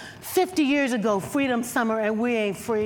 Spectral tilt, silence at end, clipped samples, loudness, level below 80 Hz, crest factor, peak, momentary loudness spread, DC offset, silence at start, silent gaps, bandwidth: -4.5 dB/octave; 0 s; under 0.1%; -24 LUFS; -62 dBFS; 14 dB; -10 dBFS; 4 LU; under 0.1%; 0 s; none; 18 kHz